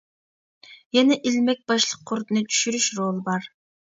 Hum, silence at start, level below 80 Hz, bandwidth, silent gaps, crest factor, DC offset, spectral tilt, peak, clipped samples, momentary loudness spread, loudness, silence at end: none; 0.7 s; -74 dBFS; 7.8 kHz; 0.86-0.90 s; 20 dB; under 0.1%; -3 dB/octave; -6 dBFS; under 0.1%; 9 LU; -22 LUFS; 0.5 s